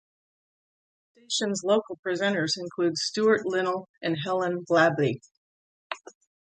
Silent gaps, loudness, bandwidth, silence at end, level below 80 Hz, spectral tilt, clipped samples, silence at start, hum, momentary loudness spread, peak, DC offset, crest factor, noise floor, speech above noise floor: 1.99-2.03 s, 3.89-3.94 s, 5.37-5.90 s; -26 LUFS; 9.4 kHz; 0.5 s; -74 dBFS; -4 dB/octave; under 0.1%; 1.3 s; none; 13 LU; -8 dBFS; under 0.1%; 20 dB; under -90 dBFS; over 64 dB